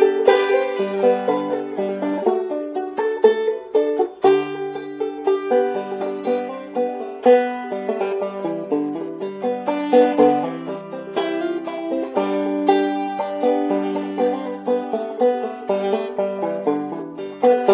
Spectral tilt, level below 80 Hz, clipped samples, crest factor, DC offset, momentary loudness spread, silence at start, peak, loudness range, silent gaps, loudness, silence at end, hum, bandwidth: -10 dB/octave; -70 dBFS; under 0.1%; 20 dB; under 0.1%; 10 LU; 0 s; 0 dBFS; 2 LU; none; -21 LUFS; 0 s; none; 4 kHz